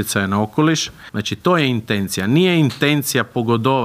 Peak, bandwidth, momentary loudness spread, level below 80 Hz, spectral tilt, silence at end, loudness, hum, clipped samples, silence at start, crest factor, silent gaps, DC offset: -2 dBFS; 16 kHz; 6 LU; -54 dBFS; -5 dB/octave; 0 s; -18 LUFS; none; under 0.1%; 0 s; 16 dB; none; under 0.1%